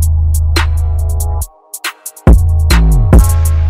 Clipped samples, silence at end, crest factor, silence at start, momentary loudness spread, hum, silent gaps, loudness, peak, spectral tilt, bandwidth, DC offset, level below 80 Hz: 0.8%; 0 s; 10 dB; 0 s; 13 LU; none; none; -12 LUFS; 0 dBFS; -5.5 dB/octave; 16 kHz; under 0.1%; -12 dBFS